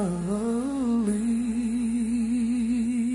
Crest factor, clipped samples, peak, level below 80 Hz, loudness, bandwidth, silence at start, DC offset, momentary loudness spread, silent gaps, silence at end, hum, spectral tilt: 10 dB; under 0.1%; -16 dBFS; -50 dBFS; -26 LUFS; 11 kHz; 0 s; under 0.1%; 2 LU; none; 0 s; none; -6.5 dB/octave